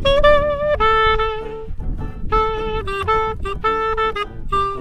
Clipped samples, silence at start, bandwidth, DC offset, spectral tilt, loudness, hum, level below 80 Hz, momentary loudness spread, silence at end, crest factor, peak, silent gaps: under 0.1%; 0 s; 9.8 kHz; under 0.1%; -5.5 dB/octave; -18 LUFS; none; -26 dBFS; 15 LU; 0 s; 16 dB; -2 dBFS; none